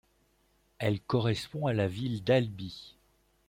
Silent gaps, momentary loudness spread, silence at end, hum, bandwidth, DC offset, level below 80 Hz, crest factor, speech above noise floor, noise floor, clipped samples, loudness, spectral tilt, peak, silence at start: none; 13 LU; 0.6 s; none; 16.5 kHz; under 0.1%; -62 dBFS; 20 dB; 40 dB; -70 dBFS; under 0.1%; -31 LUFS; -7 dB/octave; -12 dBFS; 0.8 s